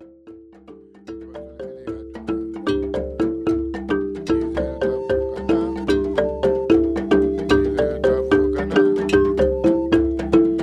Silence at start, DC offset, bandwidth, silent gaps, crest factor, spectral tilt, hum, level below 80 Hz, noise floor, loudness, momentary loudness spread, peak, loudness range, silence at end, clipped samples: 0 s; under 0.1%; 9.4 kHz; none; 16 dB; -7 dB/octave; none; -36 dBFS; -44 dBFS; -20 LUFS; 15 LU; -4 dBFS; 8 LU; 0 s; under 0.1%